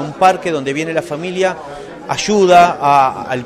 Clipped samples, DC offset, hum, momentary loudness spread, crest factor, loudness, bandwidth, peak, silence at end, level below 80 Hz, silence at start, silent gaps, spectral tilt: under 0.1%; under 0.1%; none; 13 LU; 14 dB; -14 LUFS; 14 kHz; 0 dBFS; 0 s; -50 dBFS; 0 s; none; -4.5 dB/octave